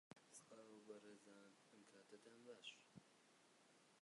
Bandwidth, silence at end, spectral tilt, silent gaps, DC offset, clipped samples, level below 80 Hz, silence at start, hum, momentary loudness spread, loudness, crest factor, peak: 11 kHz; 0 s; -3 dB/octave; none; under 0.1%; under 0.1%; under -90 dBFS; 0.1 s; none; 9 LU; -64 LUFS; 22 dB; -44 dBFS